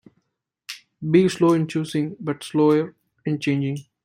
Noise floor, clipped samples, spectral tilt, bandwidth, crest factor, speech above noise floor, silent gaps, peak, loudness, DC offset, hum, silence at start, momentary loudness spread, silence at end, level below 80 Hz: -76 dBFS; under 0.1%; -7 dB/octave; 15.5 kHz; 18 dB; 55 dB; none; -4 dBFS; -22 LUFS; under 0.1%; none; 0.7 s; 18 LU; 0.25 s; -64 dBFS